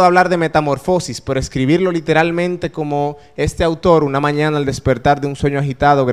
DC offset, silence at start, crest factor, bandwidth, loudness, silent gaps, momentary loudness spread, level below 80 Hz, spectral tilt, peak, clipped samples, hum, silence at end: 0.4%; 0 s; 16 dB; 13.5 kHz; -16 LUFS; none; 7 LU; -36 dBFS; -6 dB/octave; 0 dBFS; under 0.1%; none; 0 s